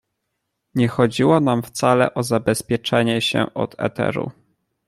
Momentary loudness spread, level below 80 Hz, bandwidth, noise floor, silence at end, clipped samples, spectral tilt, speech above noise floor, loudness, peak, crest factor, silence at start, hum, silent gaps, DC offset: 8 LU; -54 dBFS; 15.5 kHz; -76 dBFS; 0.55 s; under 0.1%; -5.5 dB/octave; 57 dB; -20 LUFS; -2 dBFS; 18 dB; 0.75 s; none; none; under 0.1%